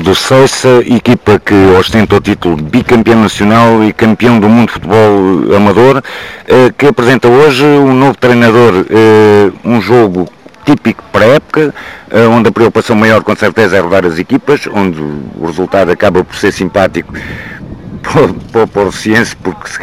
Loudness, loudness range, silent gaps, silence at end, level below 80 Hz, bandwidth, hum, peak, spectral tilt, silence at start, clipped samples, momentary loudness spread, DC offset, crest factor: -7 LUFS; 6 LU; none; 0 s; -36 dBFS; 15 kHz; none; 0 dBFS; -6 dB/octave; 0 s; 0.4%; 12 LU; 0.8%; 8 dB